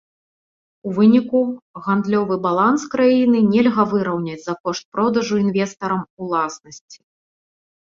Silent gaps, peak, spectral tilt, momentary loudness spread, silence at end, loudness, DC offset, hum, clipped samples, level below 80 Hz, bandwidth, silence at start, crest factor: 1.62-1.74 s, 4.60-4.64 s, 4.85-4.92 s, 6.10-6.17 s, 6.81-6.88 s; -4 dBFS; -6.5 dB/octave; 11 LU; 0.95 s; -18 LUFS; under 0.1%; none; under 0.1%; -62 dBFS; 7.6 kHz; 0.85 s; 16 dB